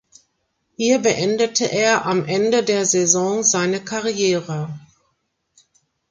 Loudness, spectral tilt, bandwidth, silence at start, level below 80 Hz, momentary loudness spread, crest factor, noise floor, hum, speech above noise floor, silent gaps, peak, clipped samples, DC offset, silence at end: -18 LUFS; -3 dB/octave; 10 kHz; 0.8 s; -62 dBFS; 8 LU; 20 dB; -70 dBFS; none; 52 dB; none; 0 dBFS; under 0.1%; under 0.1%; 1.3 s